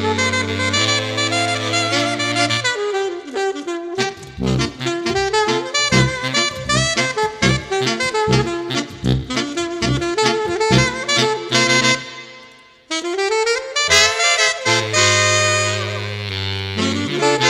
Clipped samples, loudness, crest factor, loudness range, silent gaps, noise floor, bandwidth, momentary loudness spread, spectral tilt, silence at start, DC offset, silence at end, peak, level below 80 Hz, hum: under 0.1%; -17 LUFS; 18 dB; 5 LU; none; -44 dBFS; 14 kHz; 9 LU; -3 dB/octave; 0 s; under 0.1%; 0 s; 0 dBFS; -40 dBFS; none